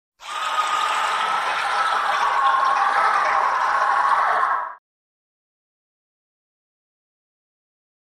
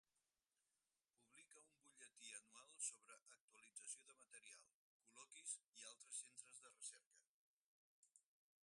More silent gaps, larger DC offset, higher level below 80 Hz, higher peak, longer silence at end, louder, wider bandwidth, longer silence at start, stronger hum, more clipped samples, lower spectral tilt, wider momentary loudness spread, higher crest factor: second, none vs 3.22-3.26 s, 3.41-3.48 s, 4.74-5.00 s, 5.69-5.73 s, 7.06-7.11 s, 7.28-8.03 s; neither; first, -66 dBFS vs under -90 dBFS; first, -8 dBFS vs -36 dBFS; first, 3.45 s vs 0.45 s; first, -20 LUFS vs -57 LUFS; first, 14.5 kHz vs 11.5 kHz; second, 0.2 s vs 1.2 s; neither; neither; first, 0.5 dB/octave vs 2.5 dB/octave; second, 5 LU vs 17 LU; second, 16 dB vs 26 dB